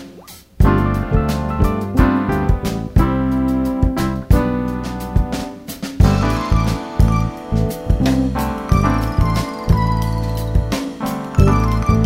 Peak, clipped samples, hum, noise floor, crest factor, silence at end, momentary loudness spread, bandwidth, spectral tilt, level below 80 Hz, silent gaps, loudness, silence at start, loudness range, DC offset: 0 dBFS; under 0.1%; none; -40 dBFS; 16 dB; 0 s; 7 LU; 16 kHz; -7 dB/octave; -22 dBFS; none; -18 LUFS; 0 s; 1 LU; under 0.1%